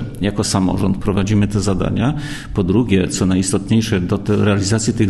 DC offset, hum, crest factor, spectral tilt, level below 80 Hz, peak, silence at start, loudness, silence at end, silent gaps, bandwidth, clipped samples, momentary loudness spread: under 0.1%; none; 14 dB; -5.5 dB/octave; -34 dBFS; -2 dBFS; 0 s; -17 LUFS; 0 s; none; 12.5 kHz; under 0.1%; 4 LU